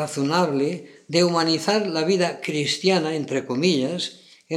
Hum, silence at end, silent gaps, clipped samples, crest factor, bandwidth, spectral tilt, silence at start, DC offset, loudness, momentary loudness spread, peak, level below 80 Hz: none; 0 s; none; under 0.1%; 18 dB; 13.5 kHz; -4.5 dB/octave; 0 s; under 0.1%; -22 LUFS; 6 LU; -4 dBFS; -78 dBFS